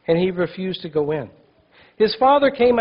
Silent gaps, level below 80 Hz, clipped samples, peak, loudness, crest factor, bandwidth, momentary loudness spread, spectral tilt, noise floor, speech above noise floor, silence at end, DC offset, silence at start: none; -54 dBFS; under 0.1%; -6 dBFS; -19 LUFS; 14 dB; 5.6 kHz; 12 LU; -9 dB/octave; -53 dBFS; 35 dB; 0 s; under 0.1%; 0.1 s